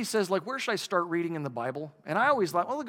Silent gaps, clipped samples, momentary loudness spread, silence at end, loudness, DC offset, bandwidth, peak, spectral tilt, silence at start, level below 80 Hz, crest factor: none; under 0.1%; 9 LU; 0 s; -29 LUFS; under 0.1%; 18.5 kHz; -12 dBFS; -4.5 dB/octave; 0 s; -82 dBFS; 18 dB